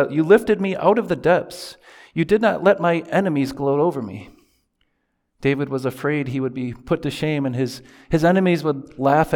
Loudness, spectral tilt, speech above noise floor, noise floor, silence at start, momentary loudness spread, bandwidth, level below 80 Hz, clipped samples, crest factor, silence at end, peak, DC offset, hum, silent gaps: -20 LUFS; -7 dB/octave; 52 dB; -71 dBFS; 0 s; 13 LU; 18.5 kHz; -50 dBFS; under 0.1%; 18 dB; 0 s; -2 dBFS; under 0.1%; none; none